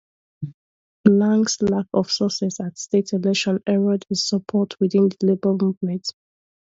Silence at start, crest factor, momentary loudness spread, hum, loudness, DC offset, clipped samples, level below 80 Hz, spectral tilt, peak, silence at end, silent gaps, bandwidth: 0.4 s; 20 dB; 11 LU; none; -21 LUFS; under 0.1%; under 0.1%; -60 dBFS; -5.5 dB/octave; -2 dBFS; 0.65 s; 0.54-1.04 s, 5.77-5.81 s; 7.8 kHz